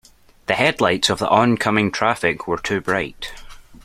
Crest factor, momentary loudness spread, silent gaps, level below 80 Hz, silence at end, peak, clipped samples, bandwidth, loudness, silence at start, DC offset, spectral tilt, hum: 18 dB; 12 LU; none; -48 dBFS; 0.1 s; -2 dBFS; under 0.1%; 15.5 kHz; -19 LUFS; 0.5 s; under 0.1%; -4.5 dB/octave; none